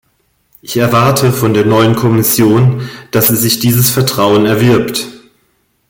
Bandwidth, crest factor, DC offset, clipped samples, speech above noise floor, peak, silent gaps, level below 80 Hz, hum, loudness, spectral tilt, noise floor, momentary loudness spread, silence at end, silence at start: 17.5 kHz; 12 dB; under 0.1%; under 0.1%; 48 dB; 0 dBFS; none; -44 dBFS; none; -10 LUFS; -5 dB/octave; -58 dBFS; 8 LU; 0.7 s; 0.65 s